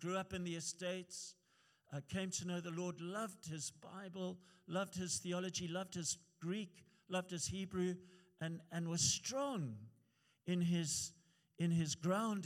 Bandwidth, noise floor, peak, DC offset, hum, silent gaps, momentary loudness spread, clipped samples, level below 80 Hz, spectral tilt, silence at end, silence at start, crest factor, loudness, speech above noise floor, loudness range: 15.5 kHz; -77 dBFS; -24 dBFS; under 0.1%; none; none; 12 LU; under 0.1%; -76 dBFS; -4 dB/octave; 0 s; 0 s; 20 dB; -42 LUFS; 35 dB; 5 LU